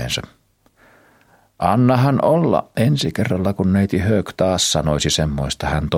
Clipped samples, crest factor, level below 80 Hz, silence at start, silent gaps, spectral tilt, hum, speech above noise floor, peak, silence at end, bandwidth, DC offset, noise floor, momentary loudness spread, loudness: under 0.1%; 16 dB; -36 dBFS; 0 s; none; -5 dB/octave; none; 39 dB; -2 dBFS; 0 s; 16 kHz; under 0.1%; -56 dBFS; 6 LU; -18 LUFS